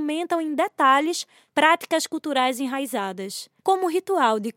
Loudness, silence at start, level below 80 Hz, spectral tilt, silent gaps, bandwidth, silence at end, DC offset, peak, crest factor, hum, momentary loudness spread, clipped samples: -23 LUFS; 0 s; -86 dBFS; -2.5 dB/octave; none; 17 kHz; 0.05 s; under 0.1%; -4 dBFS; 20 dB; none; 10 LU; under 0.1%